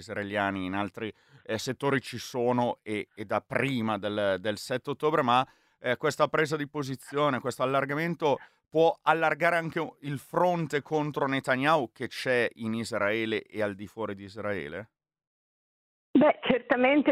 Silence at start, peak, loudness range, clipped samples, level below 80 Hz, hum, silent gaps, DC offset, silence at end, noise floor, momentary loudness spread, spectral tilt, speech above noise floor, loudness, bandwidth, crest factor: 0 s; -8 dBFS; 4 LU; under 0.1%; -70 dBFS; none; 15.27-16.14 s; under 0.1%; 0 s; under -90 dBFS; 11 LU; -5.5 dB/octave; over 62 dB; -28 LUFS; 15.5 kHz; 22 dB